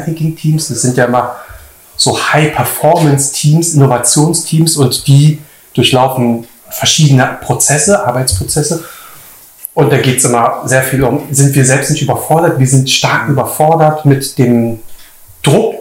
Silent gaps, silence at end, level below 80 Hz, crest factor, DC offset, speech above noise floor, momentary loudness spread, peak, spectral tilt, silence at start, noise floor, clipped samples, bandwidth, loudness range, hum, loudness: none; 0 s; -40 dBFS; 10 dB; under 0.1%; 26 dB; 8 LU; 0 dBFS; -4.5 dB/octave; 0 s; -36 dBFS; 0.5%; 16.5 kHz; 2 LU; none; -10 LUFS